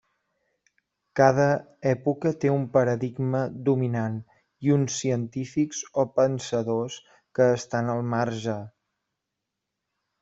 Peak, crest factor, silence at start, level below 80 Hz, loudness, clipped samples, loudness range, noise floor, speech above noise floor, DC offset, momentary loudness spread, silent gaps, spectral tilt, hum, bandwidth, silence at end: -4 dBFS; 22 dB; 1.15 s; -64 dBFS; -25 LUFS; under 0.1%; 4 LU; -84 dBFS; 59 dB; under 0.1%; 10 LU; none; -6.5 dB/octave; none; 8 kHz; 1.55 s